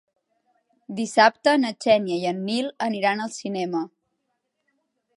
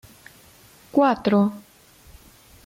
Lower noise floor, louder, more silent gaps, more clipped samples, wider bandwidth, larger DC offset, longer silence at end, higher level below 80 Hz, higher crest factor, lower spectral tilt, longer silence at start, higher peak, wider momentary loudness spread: first, -76 dBFS vs -52 dBFS; about the same, -23 LUFS vs -21 LUFS; neither; neither; second, 11.5 kHz vs 16 kHz; neither; first, 1.3 s vs 1.05 s; second, -74 dBFS vs -58 dBFS; about the same, 20 dB vs 18 dB; second, -4.5 dB/octave vs -7 dB/octave; about the same, 0.9 s vs 0.95 s; first, -4 dBFS vs -8 dBFS; first, 12 LU vs 8 LU